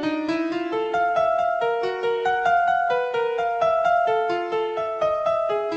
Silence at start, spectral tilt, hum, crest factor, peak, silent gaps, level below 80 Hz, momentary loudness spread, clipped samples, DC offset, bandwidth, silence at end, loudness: 0 s; -5 dB/octave; none; 12 dB; -10 dBFS; none; -60 dBFS; 5 LU; under 0.1%; under 0.1%; 8.2 kHz; 0 s; -22 LUFS